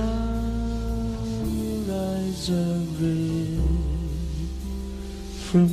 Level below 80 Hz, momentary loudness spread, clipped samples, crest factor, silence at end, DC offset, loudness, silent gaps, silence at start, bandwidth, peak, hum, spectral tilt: -32 dBFS; 9 LU; under 0.1%; 18 dB; 0 s; under 0.1%; -27 LUFS; none; 0 s; 15 kHz; -8 dBFS; none; -7 dB/octave